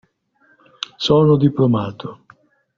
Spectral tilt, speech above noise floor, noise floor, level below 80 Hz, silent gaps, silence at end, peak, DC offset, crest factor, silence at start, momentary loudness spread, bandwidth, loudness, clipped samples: -7 dB/octave; 43 dB; -59 dBFS; -52 dBFS; none; 0.65 s; -2 dBFS; under 0.1%; 18 dB; 1 s; 19 LU; 7.4 kHz; -16 LUFS; under 0.1%